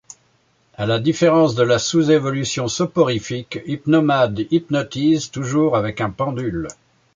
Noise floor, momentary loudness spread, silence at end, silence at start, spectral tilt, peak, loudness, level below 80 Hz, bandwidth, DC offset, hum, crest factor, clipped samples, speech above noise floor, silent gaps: -60 dBFS; 10 LU; 0.45 s; 0.8 s; -5.5 dB/octave; -4 dBFS; -19 LUFS; -50 dBFS; 9.2 kHz; under 0.1%; none; 16 dB; under 0.1%; 42 dB; none